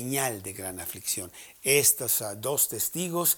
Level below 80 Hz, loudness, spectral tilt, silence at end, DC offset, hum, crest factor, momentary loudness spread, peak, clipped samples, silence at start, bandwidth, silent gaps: -64 dBFS; -26 LUFS; -2 dB/octave; 0 s; under 0.1%; none; 22 dB; 14 LU; -6 dBFS; under 0.1%; 0 s; over 20 kHz; none